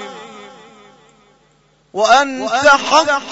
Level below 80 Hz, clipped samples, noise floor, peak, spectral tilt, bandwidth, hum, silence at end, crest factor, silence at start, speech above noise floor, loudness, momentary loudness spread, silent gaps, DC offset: -56 dBFS; under 0.1%; -55 dBFS; 0 dBFS; -1.5 dB/octave; 8 kHz; none; 0 s; 16 dB; 0 s; 42 dB; -12 LUFS; 22 LU; none; under 0.1%